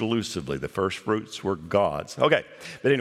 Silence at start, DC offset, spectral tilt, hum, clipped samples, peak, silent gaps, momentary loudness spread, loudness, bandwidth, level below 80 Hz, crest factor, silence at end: 0 s; under 0.1%; -5 dB/octave; none; under 0.1%; -4 dBFS; none; 8 LU; -26 LUFS; 14 kHz; -56 dBFS; 22 dB; 0 s